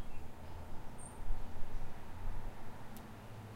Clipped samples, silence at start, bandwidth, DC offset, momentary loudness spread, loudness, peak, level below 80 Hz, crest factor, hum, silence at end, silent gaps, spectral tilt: under 0.1%; 0 s; 10 kHz; under 0.1%; 4 LU; -50 LUFS; -22 dBFS; -44 dBFS; 14 dB; none; 0 s; none; -5.5 dB/octave